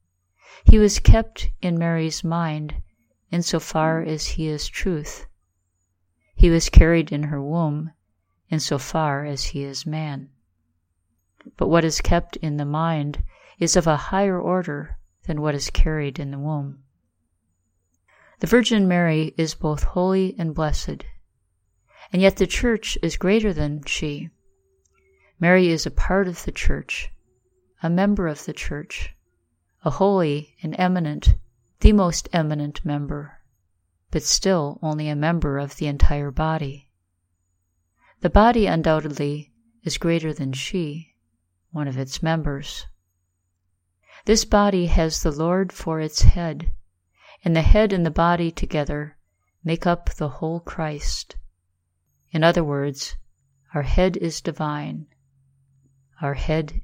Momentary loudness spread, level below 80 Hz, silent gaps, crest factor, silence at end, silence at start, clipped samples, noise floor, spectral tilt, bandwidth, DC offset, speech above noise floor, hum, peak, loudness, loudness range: 14 LU; -26 dBFS; none; 22 dB; 0 s; 0.65 s; under 0.1%; -73 dBFS; -5.5 dB/octave; 16.5 kHz; under 0.1%; 53 dB; none; 0 dBFS; -22 LUFS; 6 LU